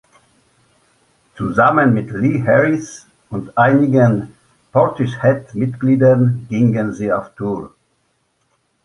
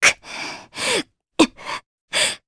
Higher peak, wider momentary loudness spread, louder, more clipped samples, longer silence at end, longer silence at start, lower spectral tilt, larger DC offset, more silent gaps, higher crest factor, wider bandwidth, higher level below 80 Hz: about the same, -2 dBFS vs 0 dBFS; about the same, 12 LU vs 12 LU; first, -16 LUFS vs -22 LUFS; neither; first, 1.2 s vs 0.1 s; first, 1.35 s vs 0 s; first, -8.5 dB/octave vs -1 dB/octave; neither; second, none vs 1.86-2.08 s; second, 16 dB vs 22 dB; about the same, 11 kHz vs 11 kHz; about the same, -52 dBFS vs -54 dBFS